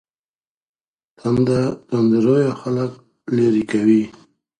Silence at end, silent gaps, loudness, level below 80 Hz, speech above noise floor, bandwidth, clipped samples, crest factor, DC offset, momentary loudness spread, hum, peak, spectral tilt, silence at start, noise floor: 0.5 s; none; -18 LUFS; -54 dBFS; over 73 dB; 10 kHz; under 0.1%; 16 dB; under 0.1%; 11 LU; none; -4 dBFS; -8 dB/octave; 1.25 s; under -90 dBFS